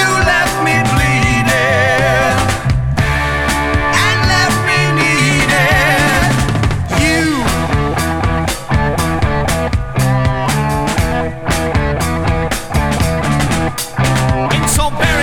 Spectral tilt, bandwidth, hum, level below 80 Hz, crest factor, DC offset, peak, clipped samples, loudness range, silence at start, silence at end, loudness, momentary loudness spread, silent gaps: -4.5 dB/octave; 19 kHz; none; -24 dBFS; 12 dB; under 0.1%; 0 dBFS; under 0.1%; 4 LU; 0 s; 0 s; -13 LUFS; 5 LU; none